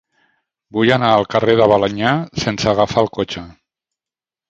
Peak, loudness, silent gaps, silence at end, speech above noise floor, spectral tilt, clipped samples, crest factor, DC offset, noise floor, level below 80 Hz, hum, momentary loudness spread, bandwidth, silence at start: 0 dBFS; -16 LUFS; none; 1 s; 75 dB; -5.5 dB/octave; under 0.1%; 16 dB; under 0.1%; -90 dBFS; -46 dBFS; none; 11 LU; 8.2 kHz; 0.75 s